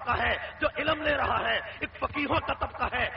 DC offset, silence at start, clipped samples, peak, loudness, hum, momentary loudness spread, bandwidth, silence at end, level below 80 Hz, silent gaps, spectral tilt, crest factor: under 0.1%; 0 s; under 0.1%; -14 dBFS; -29 LUFS; none; 6 LU; 5.8 kHz; 0 s; -46 dBFS; none; -2 dB/octave; 16 dB